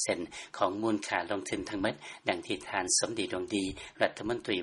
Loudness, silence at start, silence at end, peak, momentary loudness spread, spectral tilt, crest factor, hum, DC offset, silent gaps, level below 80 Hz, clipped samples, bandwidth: -32 LUFS; 0 s; 0 s; -8 dBFS; 8 LU; -2.5 dB/octave; 24 dB; none; under 0.1%; none; -60 dBFS; under 0.1%; 11.5 kHz